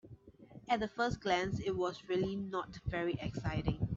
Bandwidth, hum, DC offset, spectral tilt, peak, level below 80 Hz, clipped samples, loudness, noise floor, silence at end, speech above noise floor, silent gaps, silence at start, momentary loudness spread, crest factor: 7.8 kHz; none; under 0.1%; -6.5 dB/octave; -16 dBFS; -54 dBFS; under 0.1%; -37 LUFS; -57 dBFS; 0 s; 21 dB; none; 0.05 s; 7 LU; 20 dB